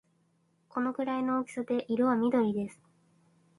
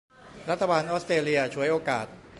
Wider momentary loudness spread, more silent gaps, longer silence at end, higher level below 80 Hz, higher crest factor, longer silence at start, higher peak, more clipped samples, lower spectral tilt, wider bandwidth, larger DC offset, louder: about the same, 9 LU vs 7 LU; neither; first, 0.85 s vs 0 s; second, -74 dBFS vs -62 dBFS; about the same, 16 dB vs 18 dB; first, 0.75 s vs 0.25 s; second, -16 dBFS vs -8 dBFS; neither; first, -7 dB/octave vs -5 dB/octave; about the same, 11.5 kHz vs 11.5 kHz; neither; second, -31 LUFS vs -26 LUFS